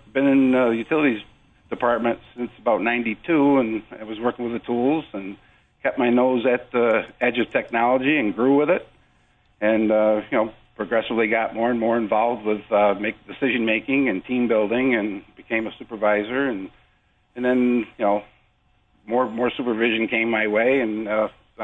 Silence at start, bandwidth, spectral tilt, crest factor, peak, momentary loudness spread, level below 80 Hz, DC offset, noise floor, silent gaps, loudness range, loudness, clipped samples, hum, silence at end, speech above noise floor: 0.15 s; 4 kHz; -8 dB/octave; 14 dB; -6 dBFS; 9 LU; -58 dBFS; under 0.1%; -62 dBFS; none; 3 LU; -21 LUFS; under 0.1%; none; 0 s; 41 dB